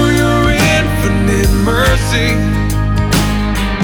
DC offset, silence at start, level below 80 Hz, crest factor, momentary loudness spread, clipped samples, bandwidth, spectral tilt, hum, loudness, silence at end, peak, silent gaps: under 0.1%; 0 s; -18 dBFS; 10 dB; 4 LU; under 0.1%; over 20 kHz; -5 dB/octave; none; -13 LUFS; 0 s; -2 dBFS; none